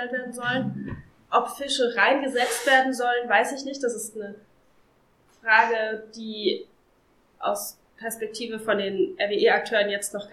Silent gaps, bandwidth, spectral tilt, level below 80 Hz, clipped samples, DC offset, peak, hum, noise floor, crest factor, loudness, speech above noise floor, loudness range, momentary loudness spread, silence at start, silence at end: none; 16 kHz; -3 dB/octave; -64 dBFS; under 0.1%; under 0.1%; -4 dBFS; none; -62 dBFS; 22 dB; -24 LUFS; 38 dB; 6 LU; 15 LU; 0 s; 0.05 s